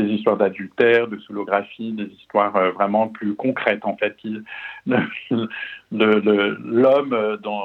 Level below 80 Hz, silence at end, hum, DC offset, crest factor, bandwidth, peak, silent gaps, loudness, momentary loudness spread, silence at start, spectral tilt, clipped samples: -72 dBFS; 0 s; none; under 0.1%; 20 dB; 5.4 kHz; -2 dBFS; none; -20 LUFS; 13 LU; 0 s; -8 dB/octave; under 0.1%